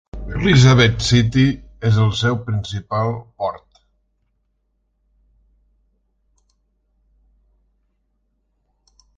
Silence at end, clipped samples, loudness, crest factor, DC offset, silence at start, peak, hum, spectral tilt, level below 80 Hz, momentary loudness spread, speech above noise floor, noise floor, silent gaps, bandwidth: 5.6 s; under 0.1%; -17 LUFS; 20 dB; under 0.1%; 0.15 s; 0 dBFS; none; -6 dB/octave; -38 dBFS; 14 LU; 52 dB; -68 dBFS; none; 8 kHz